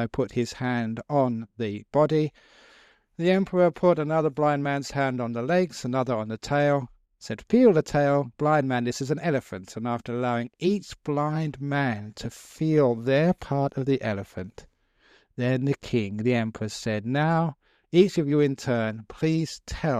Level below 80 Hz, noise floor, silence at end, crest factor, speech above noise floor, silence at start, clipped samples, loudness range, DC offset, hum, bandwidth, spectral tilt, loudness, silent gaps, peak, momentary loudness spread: -54 dBFS; -61 dBFS; 0 s; 20 dB; 37 dB; 0 s; under 0.1%; 4 LU; under 0.1%; none; 13.5 kHz; -7 dB/octave; -25 LUFS; none; -6 dBFS; 10 LU